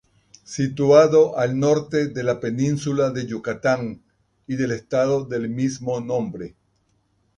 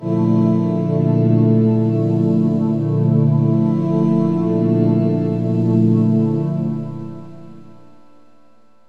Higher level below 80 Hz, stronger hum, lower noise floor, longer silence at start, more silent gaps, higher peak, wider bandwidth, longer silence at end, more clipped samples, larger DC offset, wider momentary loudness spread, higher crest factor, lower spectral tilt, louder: about the same, -58 dBFS vs -60 dBFS; neither; first, -66 dBFS vs -55 dBFS; first, 0.5 s vs 0 s; neither; about the same, -2 dBFS vs -4 dBFS; first, 10 kHz vs 4.6 kHz; second, 0.9 s vs 1.25 s; neither; second, under 0.1% vs 0.7%; first, 13 LU vs 6 LU; first, 20 dB vs 14 dB; second, -6.5 dB/octave vs -11.5 dB/octave; second, -21 LUFS vs -16 LUFS